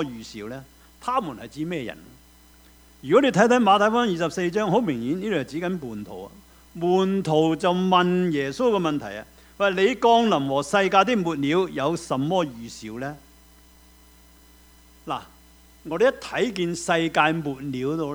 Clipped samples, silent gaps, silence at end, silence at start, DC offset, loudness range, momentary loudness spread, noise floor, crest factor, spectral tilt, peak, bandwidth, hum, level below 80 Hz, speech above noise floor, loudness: under 0.1%; none; 0 s; 0 s; under 0.1%; 9 LU; 18 LU; -52 dBFS; 20 dB; -5.5 dB/octave; -2 dBFS; over 20 kHz; none; -56 dBFS; 30 dB; -23 LUFS